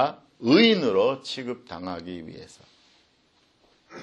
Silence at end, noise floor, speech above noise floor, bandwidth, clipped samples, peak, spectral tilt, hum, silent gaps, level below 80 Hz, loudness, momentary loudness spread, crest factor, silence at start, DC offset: 0 s; -64 dBFS; 40 dB; 9.6 kHz; under 0.1%; -6 dBFS; -5.5 dB/octave; none; none; -66 dBFS; -23 LUFS; 21 LU; 20 dB; 0 s; under 0.1%